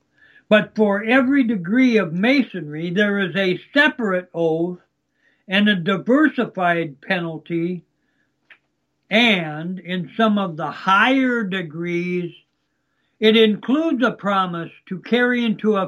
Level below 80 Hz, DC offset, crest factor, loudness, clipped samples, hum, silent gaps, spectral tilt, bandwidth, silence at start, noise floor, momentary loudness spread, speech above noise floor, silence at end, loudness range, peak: -72 dBFS; under 0.1%; 18 dB; -19 LUFS; under 0.1%; none; none; -6.5 dB/octave; 12 kHz; 0.5 s; -71 dBFS; 11 LU; 52 dB; 0 s; 4 LU; -2 dBFS